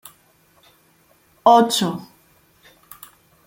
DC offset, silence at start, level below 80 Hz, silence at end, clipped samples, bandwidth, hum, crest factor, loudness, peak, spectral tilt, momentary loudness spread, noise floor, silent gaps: under 0.1%; 1.45 s; -68 dBFS; 1.4 s; under 0.1%; 17 kHz; none; 20 dB; -17 LUFS; -2 dBFS; -4 dB/octave; 28 LU; -58 dBFS; none